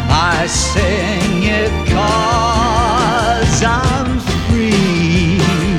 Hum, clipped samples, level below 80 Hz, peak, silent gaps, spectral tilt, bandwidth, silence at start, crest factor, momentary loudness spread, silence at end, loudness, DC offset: none; under 0.1%; -24 dBFS; 0 dBFS; none; -5 dB/octave; 15.5 kHz; 0 s; 12 dB; 3 LU; 0 s; -14 LUFS; under 0.1%